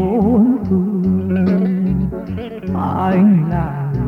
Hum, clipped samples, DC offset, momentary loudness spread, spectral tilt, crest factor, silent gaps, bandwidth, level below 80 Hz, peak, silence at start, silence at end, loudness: none; under 0.1%; under 0.1%; 10 LU; -11 dB/octave; 12 dB; none; 4.6 kHz; -34 dBFS; -4 dBFS; 0 s; 0 s; -16 LUFS